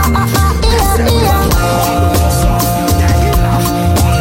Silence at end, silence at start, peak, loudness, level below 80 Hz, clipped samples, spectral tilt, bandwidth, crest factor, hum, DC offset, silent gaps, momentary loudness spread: 0 s; 0 s; 0 dBFS; -11 LUFS; -16 dBFS; under 0.1%; -5 dB/octave; 17 kHz; 10 dB; none; 0.3%; none; 1 LU